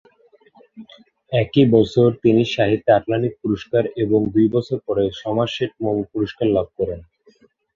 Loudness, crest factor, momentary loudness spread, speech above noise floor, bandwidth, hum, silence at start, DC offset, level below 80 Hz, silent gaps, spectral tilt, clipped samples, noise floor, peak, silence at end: -19 LUFS; 18 dB; 9 LU; 37 dB; 7.4 kHz; none; 0.75 s; under 0.1%; -50 dBFS; none; -8 dB/octave; under 0.1%; -55 dBFS; -2 dBFS; 0.75 s